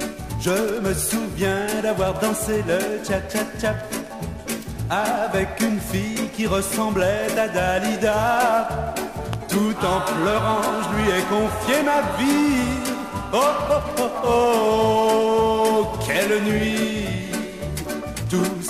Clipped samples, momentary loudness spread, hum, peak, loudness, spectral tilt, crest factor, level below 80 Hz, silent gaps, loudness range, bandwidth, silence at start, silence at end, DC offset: under 0.1%; 10 LU; none; -8 dBFS; -22 LUFS; -4.5 dB/octave; 14 dB; -40 dBFS; none; 5 LU; 15.5 kHz; 0 s; 0 s; under 0.1%